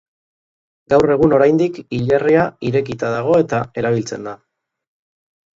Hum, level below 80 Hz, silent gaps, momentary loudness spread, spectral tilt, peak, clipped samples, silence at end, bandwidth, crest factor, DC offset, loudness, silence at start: none; -48 dBFS; none; 9 LU; -7 dB/octave; 0 dBFS; under 0.1%; 1.25 s; 7.8 kHz; 16 dB; under 0.1%; -16 LUFS; 0.9 s